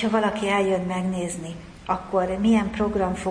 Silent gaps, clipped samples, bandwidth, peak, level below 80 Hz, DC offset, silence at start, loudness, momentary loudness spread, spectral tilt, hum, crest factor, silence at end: none; under 0.1%; 10.5 kHz; -8 dBFS; -46 dBFS; under 0.1%; 0 s; -24 LUFS; 10 LU; -6 dB/octave; none; 16 dB; 0 s